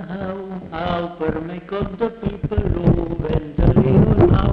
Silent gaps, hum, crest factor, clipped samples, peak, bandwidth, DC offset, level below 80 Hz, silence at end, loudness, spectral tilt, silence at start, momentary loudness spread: none; none; 16 dB; under 0.1%; -2 dBFS; 5.2 kHz; under 0.1%; -28 dBFS; 0 s; -19 LUFS; -10.5 dB/octave; 0 s; 13 LU